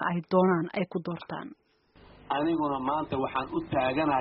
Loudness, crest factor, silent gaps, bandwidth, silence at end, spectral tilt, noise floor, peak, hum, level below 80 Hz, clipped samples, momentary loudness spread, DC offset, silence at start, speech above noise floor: -29 LUFS; 20 dB; none; 5.8 kHz; 0 s; -5.5 dB/octave; -57 dBFS; -10 dBFS; none; -58 dBFS; under 0.1%; 12 LU; under 0.1%; 0 s; 29 dB